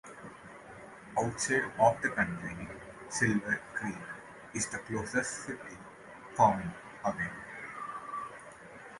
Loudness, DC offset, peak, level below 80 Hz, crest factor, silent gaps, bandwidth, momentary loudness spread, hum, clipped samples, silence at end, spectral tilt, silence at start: -33 LUFS; under 0.1%; -12 dBFS; -62 dBFS; 22 dB; none; 11.5 kHz; 22 LU; none; under 0.1%; 0 s; -4.5 dB/octave; 0.05 s